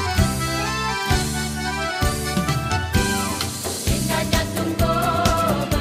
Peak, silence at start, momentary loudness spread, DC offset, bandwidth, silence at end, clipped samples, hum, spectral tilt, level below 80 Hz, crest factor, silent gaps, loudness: -4 dBFS; 0 s; 5 LU; under 0.1%; 16 kHz; 0 s; under 0.1%; none; -4 dB/octave; -30 dBFS; 18 dB; none; -21 LUFS